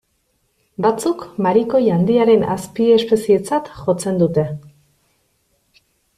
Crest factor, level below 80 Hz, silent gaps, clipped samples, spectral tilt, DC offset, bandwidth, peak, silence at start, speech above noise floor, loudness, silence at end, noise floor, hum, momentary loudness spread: 14 dB; -54 dBFS; none; under 0.1%; -6.5 dB/octave; under 0.1%; 13.5 kHz; -4 dBFS; 0.8 s; 50 dB; -17 LUFS; 1.5 s; -66 dBFS; none; 8 LU